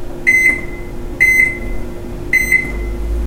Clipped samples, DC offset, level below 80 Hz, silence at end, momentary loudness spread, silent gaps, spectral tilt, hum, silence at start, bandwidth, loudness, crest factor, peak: under 0.1%; under 0.1%; -24 dBFS; 0 s; 19 LU; none; -4 dB/octave; none; 0 s; 16 kHz; -12 LUFS; 16 dB; 0 dBFS